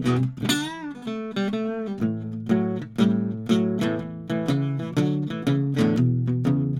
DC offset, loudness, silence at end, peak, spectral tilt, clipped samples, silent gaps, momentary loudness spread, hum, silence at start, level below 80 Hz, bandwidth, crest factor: under 0.1%; -25 LUFS; 0 s; -8 dBFS; -6.5 dB/octave; under 0.1%; none; 8 LU; none; 0 s; -58 dBFS; 16 kHz; 16 dB